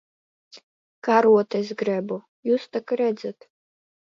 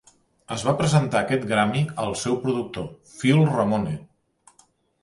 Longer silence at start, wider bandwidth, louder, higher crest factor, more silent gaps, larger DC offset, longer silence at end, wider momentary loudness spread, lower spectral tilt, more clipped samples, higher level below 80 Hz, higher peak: about the same, 0.55 s vs 0.5 s; second, 7.2 kHz vs 11.5 kHz; about the same, -23 LUFS vs -23 LUFS; about the same, 20 dB vs 18 dB; first, 0.63-1.02 s, 2.28-2.43 s vs none; neither; second, 0.7 s vs 1 s; about the same, 15 LU vs 13 LU; about the same, -6.5 dB/octave vs -6 dB/octave; neither; second, -74 dBFS vs -54 dBFS; about the same, -4 dBFS vs -6 dBFS